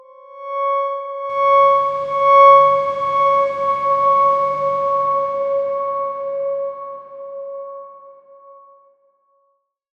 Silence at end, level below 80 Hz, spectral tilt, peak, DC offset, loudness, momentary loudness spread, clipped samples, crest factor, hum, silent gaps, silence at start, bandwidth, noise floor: 1.45 s; -64 dBFS; -5 dB/octave; -2 dBFS; under 0.1%; -16 LUFS; 20 LU; under 0.1%; 16 dB; none; none; 0.3 s; 6.4 kHz; -66 dBFS